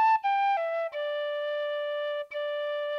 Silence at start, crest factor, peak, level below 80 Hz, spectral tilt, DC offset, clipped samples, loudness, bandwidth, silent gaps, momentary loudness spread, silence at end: 0 s; 12 dB; -18 dBFS; -86 dBFS; 0 dB/octave; under 0.1%; under 0.1%; -29 LUFS; 6.6 kHz; none; 7 LU; 0 s